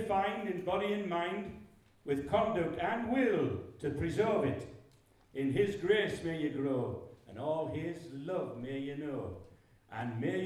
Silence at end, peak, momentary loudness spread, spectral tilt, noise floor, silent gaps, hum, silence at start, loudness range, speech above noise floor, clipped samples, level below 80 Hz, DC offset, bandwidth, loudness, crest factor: 0 s; -18 dBFS; 14 LU; -7 dB/octave; -64 dBFS; none; none; 0 s; 5 LU; 30 dB; under 0.1%; -62 dBFS; under 0.1%; 13 kHz; -35 LUFS; 18 dB